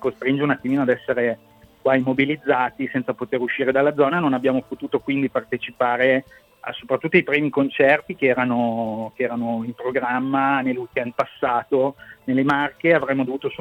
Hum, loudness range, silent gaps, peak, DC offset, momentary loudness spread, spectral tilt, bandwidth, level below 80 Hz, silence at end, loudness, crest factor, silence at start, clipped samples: none; 3 LU; none; -2 dBFS; under 0.1%; 8 LU; -8 dB/octave; 6 kHz; -62 dBFS; 0.05 s; -21 LUFS; 18 dB; 0 s; under 0.1%